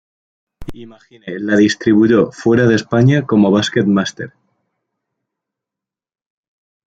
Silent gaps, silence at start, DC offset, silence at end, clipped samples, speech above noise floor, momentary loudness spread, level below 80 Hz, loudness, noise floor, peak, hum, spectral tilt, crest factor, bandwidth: none; 0.6 s; under 0.1%; 2.6 s; under 0.1%; 73 dB; 20 LU; -50 dBFS; -13 LUFS; -86 dBFS; -2 dBFS; none; -6.5 dB/octave; 16 dB; 8 kHz